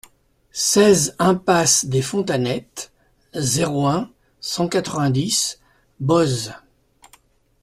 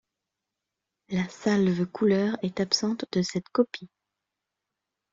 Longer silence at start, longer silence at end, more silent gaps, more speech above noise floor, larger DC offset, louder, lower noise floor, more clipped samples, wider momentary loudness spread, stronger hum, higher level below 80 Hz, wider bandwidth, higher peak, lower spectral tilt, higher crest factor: second, 0.55 s vs 1.1 s; second, 1.05 s vs 1.25 s; neither; second, 38 dB vs 60 dB; neither; first, -19 LUFS vs -27 LUFS; second, -57 dBFS vs -86 dBFS; neither; first, 17 LU vs 7 LU; neither; first, -54 dBFS vs -66 dBFS; first, 15 kHz vs 7.8 kHz; first, -2 dBFS vs -10 dBFS; second, -4 dB/octave vs -5.5 dB/octave; about the same, 18 dB vs 18 dB